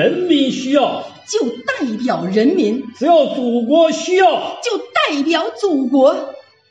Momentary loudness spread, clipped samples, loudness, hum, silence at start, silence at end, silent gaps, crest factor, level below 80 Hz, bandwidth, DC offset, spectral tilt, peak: 8 LU; under 0.1%; -16 LUFS; none; 0 s; 0.3 s; none; 14 dB; -68 dBFS; 9.2 kHz; under 0.1%; -4.5 dB/octave; -2 dBFS